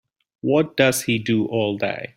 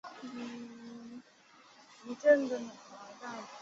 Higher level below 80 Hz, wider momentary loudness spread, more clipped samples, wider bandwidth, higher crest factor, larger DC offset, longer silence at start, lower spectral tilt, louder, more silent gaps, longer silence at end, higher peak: first, -60 dBFS vs -82 dBFS; second, 6 LU vs 24 LU; neither; first, 16.5 kHz vs 7.8 kHz; about the same, 20 dB vs 24 dB; neither; first, 0.45 s vs 0.05 s; first, -4.5 dB/octave vs -3 dB/octave; first, -21 LUFS vs -33 LUFS; neither; about the same, 0.1 s vs 0 s; first, -2 dBFS vs -12 dBFS